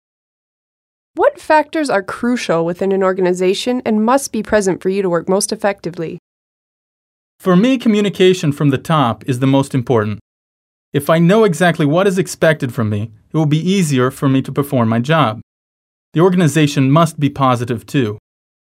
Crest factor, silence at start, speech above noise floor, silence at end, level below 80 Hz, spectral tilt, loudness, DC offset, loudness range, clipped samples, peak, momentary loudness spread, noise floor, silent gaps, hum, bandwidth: 16 dB; 1.15 s; over 76 dB; 0.45 s; -52 dBFS; -6 dB/octave; -15 LUFS; under 0.1%; 3 LU; under 0.1%; 0 dBFS; 9 LU; under -90 dBFS; 6.19-7.39 s, 10.21-10.92 s, 15.43-16.12 s; none; 16 kHz